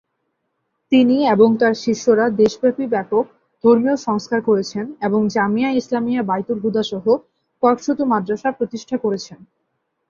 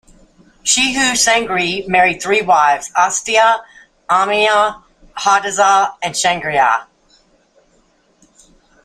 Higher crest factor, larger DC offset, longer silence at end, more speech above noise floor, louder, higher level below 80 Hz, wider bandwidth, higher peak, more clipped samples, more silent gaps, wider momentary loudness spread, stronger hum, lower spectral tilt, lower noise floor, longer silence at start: about the same, 16 dB vs 16 dB; neither; second, 0.65 s vs 2 s; first, 55 dB vs 42 dB; second, -18 LUFS vs -14 LUFS; second, -60 dBFS vs -50 dBFS; second, 7.4 kHz vs 15.5 kHz; about the same, -2 dBFS vs 0 dBFS; neither; neither; first, 9 LU vs 6 LU; neither; first, -6 dB/octave vs -1.5 dB/octave; first, -72 dBFS vs -56 dBFS; first, 0.9 s vs 0.65 s